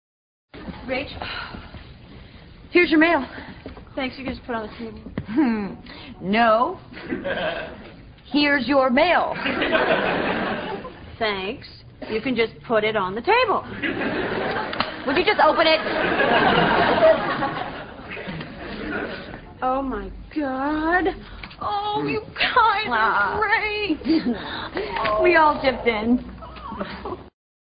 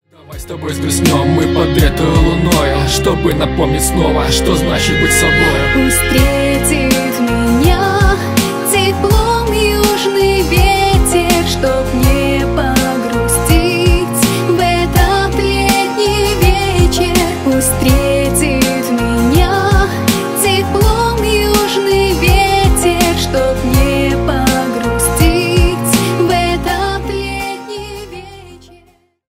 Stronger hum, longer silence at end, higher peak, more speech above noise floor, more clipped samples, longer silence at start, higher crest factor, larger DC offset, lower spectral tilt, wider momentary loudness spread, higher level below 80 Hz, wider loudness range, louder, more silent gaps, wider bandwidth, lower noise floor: neither; second, 0.4 s vs 0.7 s; second, -4 dBFS vs 0 dBFS; second, 22 dB vs 39 dB; neither; first, 0.55 s vs 0.3 s; first, 20 dB vs 12 dB; neither; first, -9.5 dB/octave vs -4.5 dB/octave; first, 19 LU vs 4 LU; second, -46 dBFS vs -20 dBFS; first, 6 LU vs 1 LU; second, -21 LUFS vs -12 LUFS; neither; second, 5.2 kHz vs 16.5 kHz; second, -44 dBFS vs -50 dBFS